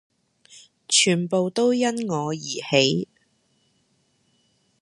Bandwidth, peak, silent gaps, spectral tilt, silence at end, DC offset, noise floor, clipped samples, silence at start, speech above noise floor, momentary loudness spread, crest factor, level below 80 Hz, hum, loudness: 11.5 kHz; -2 dBFS; none; -3.5 dB/octave; 1.75 s; under 0.1%; -67 dBFS; under 0.1%; 0.55 s; 45 dB; 10 LU; 22 dB; -70 dBFS; none; -21 LUFS